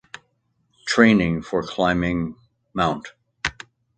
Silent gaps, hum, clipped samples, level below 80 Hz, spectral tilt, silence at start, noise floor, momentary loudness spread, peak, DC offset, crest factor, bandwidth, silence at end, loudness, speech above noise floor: none; none; under 0.1%; -46 dBFS; -5.5 dB/octave; 0.85 s; -69 dBFS; 19 LU; 0 dBFS; under 0.1%; 22 dB; 9 kHz; 0.45 s; -21 LUFS; 49 dB